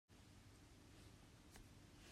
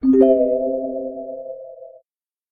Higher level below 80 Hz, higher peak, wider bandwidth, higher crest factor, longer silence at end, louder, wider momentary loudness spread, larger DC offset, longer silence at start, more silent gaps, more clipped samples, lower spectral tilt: second, -72 dBFS vs -54 dBFS; second, -46 dBFS vs -2 dBFS; first, 15 kHz vs 3.3 kHz; about the same, 20 dB vs 18 dB; second, 0 s vs 0.6 s; second, -65 LUFS vs -18 LUFS; second, 2 LU vs 21 LU; neither; about the same, 0.1 s vs 0 s; neither; neither; second, -4 dB/octave vs -10 dB/octave